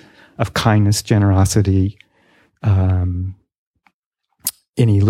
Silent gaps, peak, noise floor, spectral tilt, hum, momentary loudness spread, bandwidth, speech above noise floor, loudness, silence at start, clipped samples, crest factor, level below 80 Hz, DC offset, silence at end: 3.58-3.74 s, 3.94-4.12 s, 4.69-4.73 s; 0 dBFS; -73 dBFS; -6 dB/octave; none; 11 LU; 16.5 kHz; 59 dB; -17 LUFS; 0.4 s; under 0.1%; 16 dB; -42 dBFS; under 0.1%; 0 s